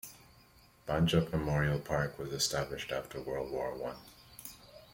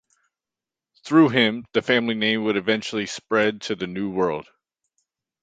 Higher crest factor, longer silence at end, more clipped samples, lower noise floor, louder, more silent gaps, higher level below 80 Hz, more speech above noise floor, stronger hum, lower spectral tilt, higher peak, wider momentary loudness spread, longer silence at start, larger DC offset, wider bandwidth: about the same, 20 dB vs 20 dB; second, 0.1 s vs 1 s; neither; second, -62 dBFS vs -89 dBFS; second, -34 LUFS vs -22 LUFS; neither; first, -54 dBFS vs -62 dBFS; second, 28 dB vs 67 dB; neither; about the same, -5 dB/octave vs -5 dB/octave; second, -16 dBFS vs -4 dBFS; first, 19 LU vs 10 LU; second, 0.05 s vs 1.05 s; neither; first, 16.5 kHz vs 9 kHz